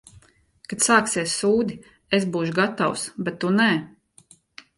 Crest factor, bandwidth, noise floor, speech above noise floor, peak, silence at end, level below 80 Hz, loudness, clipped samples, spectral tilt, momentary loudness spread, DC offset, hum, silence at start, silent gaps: 20 dB; 11.5 kHz; -55 dBFS; 33 dB; -4 dBFS; 0.9 s; -60 dBFS; -22 LUFS; under 0.1%; -3.5 dB/octave; 11 LU; under 0.1%; none; 0.7 s; none